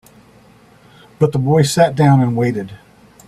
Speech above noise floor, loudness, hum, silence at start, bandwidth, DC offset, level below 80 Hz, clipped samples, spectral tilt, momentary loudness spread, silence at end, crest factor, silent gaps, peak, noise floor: 33 dB; -15 LUFS; none; 1.2 s; 14 kHz; under 0.1%; -50 dBFS; under 0.1%; -6.5 dB/octave; 10 LU; 0.5 s; 16 dB; none; 0 dBFS; -47 dBFS